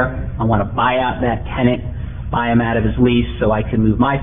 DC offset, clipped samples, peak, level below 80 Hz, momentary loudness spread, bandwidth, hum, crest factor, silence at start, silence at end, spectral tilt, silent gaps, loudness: 1%; under 0.1%; -2 dBFS; -28 dBFS; 6 LU; 3.8 kHz; none; 16 dB; 0 s; 0 s; -11 dB/octave; none; -17 LUFS